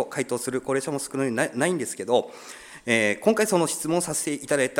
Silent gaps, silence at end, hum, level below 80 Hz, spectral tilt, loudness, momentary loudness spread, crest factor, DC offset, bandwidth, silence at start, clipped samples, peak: none; 0 s; none; -64 dBFS; -4 dB/octave; -25 LUFS; 7 LU; 20 dB; under 0.1%; 18 kHz; 0 s; under 0.1%; -6 dBFS